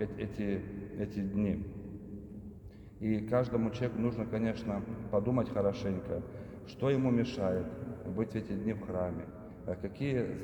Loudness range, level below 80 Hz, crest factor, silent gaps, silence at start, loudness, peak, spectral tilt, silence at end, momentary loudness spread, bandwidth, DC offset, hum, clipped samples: 3 LU; -56 dBFS; 18 dB; none; 0 s; -35 LUFS; -18 dBFS; -8.5 dB/octave; 0 s; 15 LU; 19 kHz; under 0.1%; none; under 0.1%